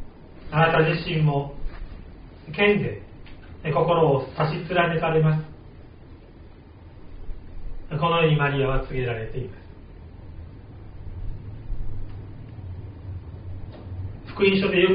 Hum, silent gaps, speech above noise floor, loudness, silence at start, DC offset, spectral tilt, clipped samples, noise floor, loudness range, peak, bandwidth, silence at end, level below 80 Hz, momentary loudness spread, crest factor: none; none; 24 dB; -23 LUFS; 0 s; under 0.1%; -5 dB/octave; under 0.1%; -45 dBFS; 15 LU; -6 dBFS; 5.2 kHz; 0 s; -38 dBFS; 24 LU; 20 dB